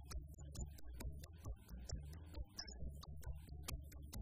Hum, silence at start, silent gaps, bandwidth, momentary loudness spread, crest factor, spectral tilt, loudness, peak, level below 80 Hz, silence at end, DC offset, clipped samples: none; 0 s; none; 15.5 kHz; 4 LU; 18 dB; -4.5 dB/octave; -53 LUFS; -32 dBFS; -52 dBFS; 0 s; under 0.1%; under 0.1%